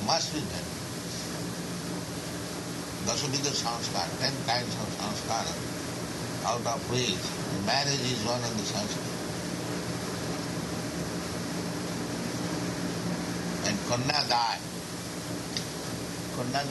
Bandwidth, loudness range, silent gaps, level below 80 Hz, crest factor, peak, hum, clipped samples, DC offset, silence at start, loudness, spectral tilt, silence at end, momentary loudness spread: 12 kHz; 4 LU; none; -56 dBFS; 22 dB; -10 dBFS; none; under 0.1%; under 0.1%; 0 s; -31 LUFS; -3.5 dB/octave; 0 s; 8 LU